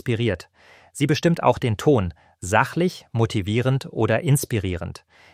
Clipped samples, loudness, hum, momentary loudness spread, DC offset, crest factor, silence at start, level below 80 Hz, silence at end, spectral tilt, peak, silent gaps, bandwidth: under 0.1%; -22 LUFS; none; 12 LU; under 0.1%; 20 dB; 0.05 s; -48 dBFS; 0.4 s; -6 dB/octave; -2 dBFS; none; 16 kHz